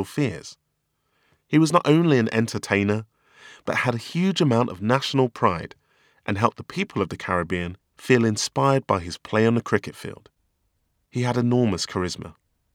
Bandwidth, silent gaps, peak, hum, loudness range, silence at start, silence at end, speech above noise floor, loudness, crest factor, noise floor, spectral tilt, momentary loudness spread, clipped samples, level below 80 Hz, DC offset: 16 kHz; none; -2 dBFS; none; 3 LU; 0 s; 0.45 s; 52 dB; -23 LUFS; 22 dB; -74 dBFS; -5.5 dB/octave; 16 LU; under 0.1%; -56 dBFS; under 0.1%